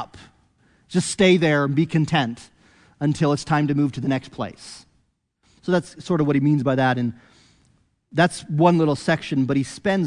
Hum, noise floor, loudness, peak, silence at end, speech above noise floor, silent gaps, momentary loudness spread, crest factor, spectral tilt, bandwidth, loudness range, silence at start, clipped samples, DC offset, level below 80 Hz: none; -67 dBFS; -21 LUFS; -2 dBFS; 0 s; 46 dB; none; 13 LU; 18 dB; -6 dB/octave; 11 kHz; 4 LU; 0 s; under 0.1%; under 0.1%; -56 dBFS